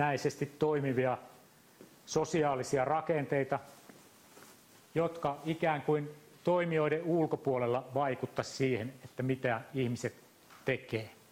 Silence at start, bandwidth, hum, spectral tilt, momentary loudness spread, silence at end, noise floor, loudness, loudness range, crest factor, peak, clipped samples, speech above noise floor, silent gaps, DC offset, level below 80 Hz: 0 s; 16 kHz; none; -6 dB/octave; 8 LU; 0.2 s; -59 dBFS; -34 LUFS; 3 LU; 16 dB; -18 dBFS; under 0.1%; 26 dB; none; under 0.1%; -70 dBFS